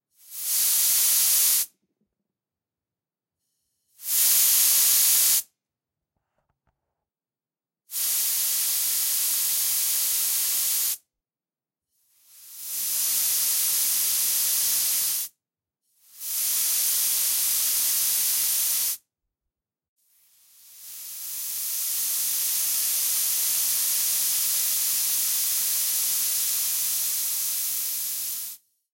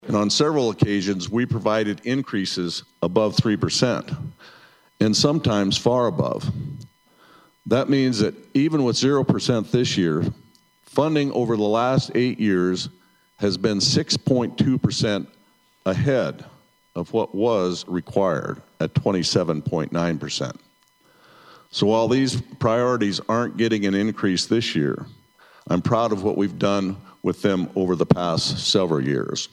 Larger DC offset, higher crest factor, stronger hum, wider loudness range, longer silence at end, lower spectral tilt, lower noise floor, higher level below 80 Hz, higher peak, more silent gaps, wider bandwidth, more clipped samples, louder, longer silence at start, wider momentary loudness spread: neither; about the same, 20 dB vs 20 dB; neither; first, 6 LU vs 3 LU; first, 0.35 s vs 0.05 s; second, 3.5 dB/octave vs -5.5 dB/octave; first, under -90 dBFS vs -59 dBFS; second, -74 dBFS vs -54 dBFS; second, -6 dBFS vs -2 dBFS; first, 19.88-19.97 s vs none; first, 16.5 kHz vs 13 kHz; neither; about the same, -21 LUFS vs -22 LUFS; first, 0.3 s vs 0.05 s; first, 12 LU vs 9 LU